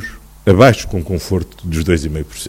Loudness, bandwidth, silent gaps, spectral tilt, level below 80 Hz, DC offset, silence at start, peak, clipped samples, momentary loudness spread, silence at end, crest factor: -15 LUFS; 16.5 kHz; none; -6 dB/octave; -30 dBFS; under 0.1%; 0 s; 0 dBFS; 0.3%; 13 LU; 0 s; 16 dB